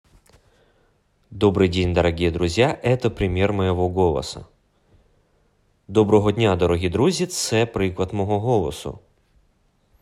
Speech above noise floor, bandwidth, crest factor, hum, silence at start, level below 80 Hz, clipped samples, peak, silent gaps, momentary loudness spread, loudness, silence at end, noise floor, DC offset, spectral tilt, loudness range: 43 dB; 14 kHz; 18 dB; none; 1.3 s; -44 dBFS; under 0.1%; -4 dBFS; none; 7 LU; -20 LUFS; 1.05 s; -63 dBFS; under 0.1%; -6 dB/octave; 3 LU